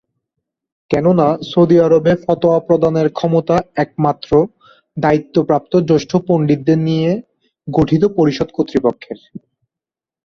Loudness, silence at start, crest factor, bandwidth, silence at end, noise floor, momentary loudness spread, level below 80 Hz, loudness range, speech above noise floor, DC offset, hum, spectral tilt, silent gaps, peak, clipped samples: -15 LUFS; 0.9 s; 14 dB; 7.2 kHz; 0.9 s; -88 dBFS; 8 LU; -46 dBFS; 3 LU; 74 dB; under 0.1%; none; -8 dB/octave; none; -2 dBFS; under 0.1%